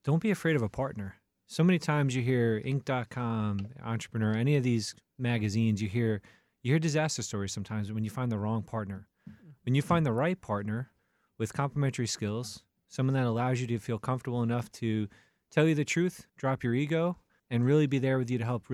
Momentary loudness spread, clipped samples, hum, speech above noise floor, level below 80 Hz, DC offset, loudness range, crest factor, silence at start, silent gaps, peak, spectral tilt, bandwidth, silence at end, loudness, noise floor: 11 LU; under 0.1%; none; 23 dB; -64 dBFS; under 0.1%; 3 LU; 18 dB; 0.05 s; none; -12 dBFS; -6.5 dB/octave; 13.5 kHz; 0 s; -31 LUFS; -53 dBFS